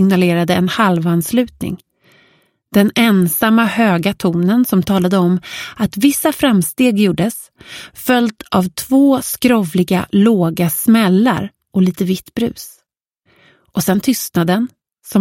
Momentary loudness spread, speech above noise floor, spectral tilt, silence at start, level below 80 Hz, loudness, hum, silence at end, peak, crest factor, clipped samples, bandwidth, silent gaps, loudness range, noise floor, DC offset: 10 LU; 52 dB; -5.5 dB/octave; 0 s; -48 dBFS; -15 LUFS; none; 0 s; 0 dBFS; 14 dB; under 0.1%; 16.5 kHz; none; 4 LU; -66 dBFS; under 0.1%